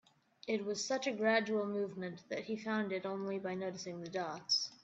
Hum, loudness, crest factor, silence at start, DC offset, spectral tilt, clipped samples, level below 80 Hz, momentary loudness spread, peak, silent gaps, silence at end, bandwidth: none; -37 LUFS; 20 dB; 0.45 s; under 0.1%; -3.5 dB/octave; under 0.1%; -84 dBFS; 10 LU; -18 dBFS; none; 0.1 s; 8.2 kHz